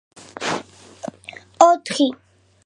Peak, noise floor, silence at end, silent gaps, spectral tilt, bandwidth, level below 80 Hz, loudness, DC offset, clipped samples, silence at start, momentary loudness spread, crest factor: 0 dBFS; -42 dBFS; 0.5 s; none; -3.5 dB/octave; 11 kHz; -64 dBFS; -19 LUFS; under 0.1%; under 0.1%; 0.4 s; 24 LU; 22 dB